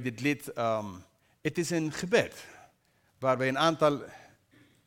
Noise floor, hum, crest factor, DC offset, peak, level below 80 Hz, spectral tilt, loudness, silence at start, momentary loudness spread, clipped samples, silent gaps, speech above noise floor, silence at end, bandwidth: -69 dBFS; none; 20 dB; under 0.1%; -10 dBFS; -68 dBFS; -5 dB/octave; -30 LUFS; 0 s; 20 LU; under 0.1%; none; 40 dB; 0.7 s; 17.5 kHz